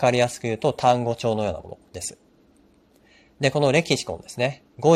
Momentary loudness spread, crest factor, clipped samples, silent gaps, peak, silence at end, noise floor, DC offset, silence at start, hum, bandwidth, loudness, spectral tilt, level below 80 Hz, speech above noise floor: 13 LU; 20 dB; under 0.1%; none; -4 dBFS; 0 s; -58 dBFS; under 0.1%; 0 s; none; 15.5 kHz; -23 LUFS; -5 dB/octave; -56 dBFS; 35 dB